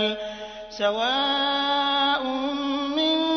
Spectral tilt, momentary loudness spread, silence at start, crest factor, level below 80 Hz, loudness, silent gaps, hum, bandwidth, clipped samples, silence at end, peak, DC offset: -3 dB/octave; 11 LU; 0 s; 14 dB; -58 dBFS; -23 LUFS; none; none; 6.6 kHz; under 0.1%; 0 s; -10 dBFS; under 0.1%